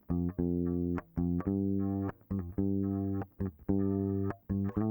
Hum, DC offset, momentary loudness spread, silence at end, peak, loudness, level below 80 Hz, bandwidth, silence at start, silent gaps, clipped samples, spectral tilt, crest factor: none; under 0.1%; 5 LU; 0 s; -16 dBFS; -34 LUFS; -54 dBFS; over 20 kHz; 0.1 s; none; under 0.1%; -13 dB/octave; 18 dB